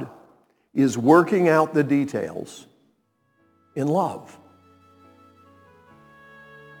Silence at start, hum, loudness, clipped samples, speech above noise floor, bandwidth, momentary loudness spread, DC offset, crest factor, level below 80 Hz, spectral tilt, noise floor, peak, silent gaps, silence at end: 0 s; none; -21 LUFS; under 0.1%; 47 dB; 18.5 kHz; 23 LU; under 0.1%; 22 dB; -72 dBFS; -7 dB/octave; -68 dBFS; -2 dBFS; none; 2.55 s